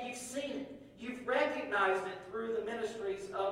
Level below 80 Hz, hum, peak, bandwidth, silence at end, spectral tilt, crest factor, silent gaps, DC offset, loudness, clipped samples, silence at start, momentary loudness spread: -70 dBFS; none; -18 dBFS; 16 kHz; 0 s; -3.5 dB/octave; 18 dB; none; under 0.1%; -36 LUFS; under 0.1%; 0 s; 12 LU